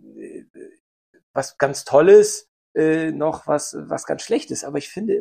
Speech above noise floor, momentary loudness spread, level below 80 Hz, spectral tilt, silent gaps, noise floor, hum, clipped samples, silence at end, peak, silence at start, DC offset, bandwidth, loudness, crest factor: 20 dB; 18 LU; -62 dBFS; -4.5 dB/octave; 0.50-0.54 s, 0.80-1.14 s, 1.23-1.34 s, 2.48-2.75 s; -38 dBFS; none; under 0.1%; 0 s; -2 dBFS; 0.15 s; under 0.1%; 15 kHz; -19 LUFS; 18 dB